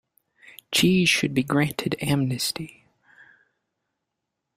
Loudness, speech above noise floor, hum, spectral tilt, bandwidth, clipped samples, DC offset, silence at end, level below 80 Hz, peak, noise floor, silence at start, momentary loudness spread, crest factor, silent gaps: -23 LUFS; 59 dB; none; -4.5 dB/octave; 16 kHz; under 0.1%; under 0.1%; 1.9 s; -58 dBFS; -8 dBFS; -82 dBFS; 0.45 s; 9 LU; 18 dB; none